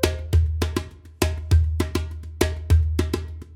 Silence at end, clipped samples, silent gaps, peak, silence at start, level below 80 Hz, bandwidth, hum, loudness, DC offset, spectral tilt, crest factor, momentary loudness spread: 0 s; under 0.1%; none; -2 dBFS; 0 s; -30 dBFS; 16 kHz; none; -24 LUFS; under 0.1%; -6 dB/octave; 20 dB; 10 LU